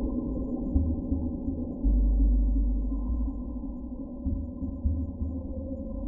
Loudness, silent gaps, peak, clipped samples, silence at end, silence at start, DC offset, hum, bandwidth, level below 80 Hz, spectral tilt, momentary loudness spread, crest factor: -31 LUFS; none; -12 dBFS; under 0.1%; 0 s; 0 s; under 0.1%; none; 1.1 kHz; -30 dBFS; -15.5 dB/octave; 10 LU; 16 dB